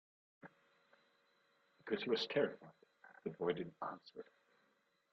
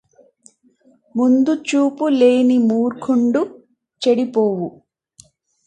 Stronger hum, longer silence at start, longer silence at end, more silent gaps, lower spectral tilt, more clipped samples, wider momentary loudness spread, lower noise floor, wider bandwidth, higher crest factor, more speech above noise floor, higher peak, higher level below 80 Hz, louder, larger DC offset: neither; second, 0.45 s vs 1.15 s; about the same, 0.9 s vs 1 s; neither; second, -3 dB/octave vs -6 dB/octave; neither; first, 25 LU vs 10 LU; first, -79 dBFS vs -56 dBFS; second, 7.2 kHz vs 9.2 kHz; first, 22 dB vs 16 dB; about the same, 38 dB vs 40 dB; second, -24 dBFS vs -2 dBFS; second, -86 dBFS vs -68 dBFS; second, -41 LUFS vs -17 LUFS; neither